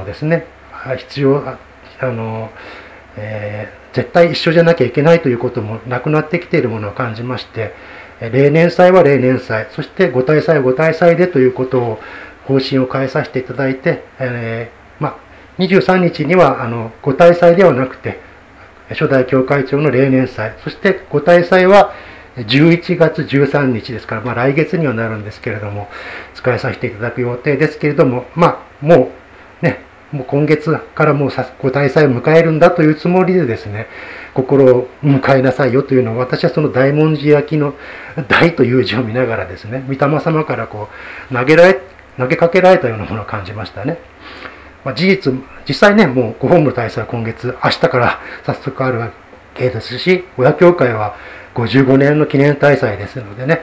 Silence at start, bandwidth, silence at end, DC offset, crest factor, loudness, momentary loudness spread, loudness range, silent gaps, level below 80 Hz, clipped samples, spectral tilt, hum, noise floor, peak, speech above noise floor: 0 s; 8 kHz; 0 s; under 0.1%; 14 dB; -13 LUFS; 16 LU; 6 LU; none; -46 dBFS; 0.3%; -8 dB/octave; none; -40 dBFS; 0 dBFS; 27 dB